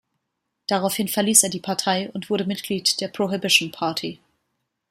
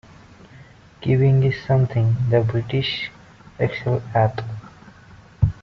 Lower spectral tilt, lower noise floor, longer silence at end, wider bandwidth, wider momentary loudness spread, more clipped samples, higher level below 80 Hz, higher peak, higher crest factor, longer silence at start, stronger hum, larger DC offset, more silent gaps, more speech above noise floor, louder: second, -2.5 dB/octave vs -6 dB/octave; first, -79 dBFS vs -46 dBFS; first, 0.75 s vs 0.1 s; first, 15.5 kHz vs 6.2 kHz; second, 10 LU vs 13 LU; neither; second, -68 dBFS vs -44 dBFS; first, 0 dBFS vs -4 dBFS; first, 24 dB vs 18 dB; about the same, 0.7 s vs 0.6 s; neither; neither; neither; first, 56 dB vs 27 dB; about the same, -21 LUFS vs -21 LUFS